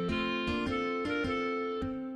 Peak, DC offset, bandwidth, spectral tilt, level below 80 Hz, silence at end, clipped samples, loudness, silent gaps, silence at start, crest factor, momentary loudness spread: -20 dBFS; under 0.1%; 10.5 kHz; -6 dB/octave; -50 dBFS; 0 s; under 0.1%; -33 LUFS; none; 0 s; 12 dB; 3 LU